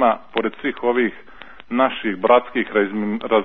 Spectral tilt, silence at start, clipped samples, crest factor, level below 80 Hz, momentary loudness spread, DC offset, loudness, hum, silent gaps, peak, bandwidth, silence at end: -8.5 dB/octave; 0 s; under 0.1%; 18 dB; -56 dBFS; 8 LU; 0.8%; -20 LUFS; none; none; -2 dBFS; 4.2 kHz; 0 s